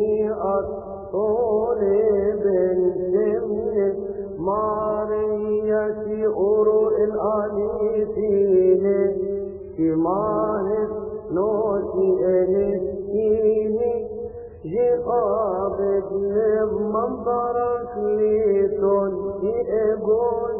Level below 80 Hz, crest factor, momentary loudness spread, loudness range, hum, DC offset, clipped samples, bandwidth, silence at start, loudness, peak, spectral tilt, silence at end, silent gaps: -48 dBFS; 14 dB; 7 LU; 2 LU; none; under 0.1%; under 0.1%; 2.8 kHz; 0 s; -22 LUFS; -8 dBFS; -13.5 dB/octave; 0 s; none